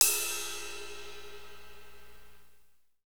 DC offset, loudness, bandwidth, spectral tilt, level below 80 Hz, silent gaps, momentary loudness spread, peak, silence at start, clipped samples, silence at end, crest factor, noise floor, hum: 0.7%; -33 LUFS; over 20 kHz; 1 dB/octave; -62 dBFS; none; 24 LU; -2 dBFS; 0 s; under 0.1%; 0.05 s; 34 dB; -62 dBFS; 60 Hz at -65 dBFS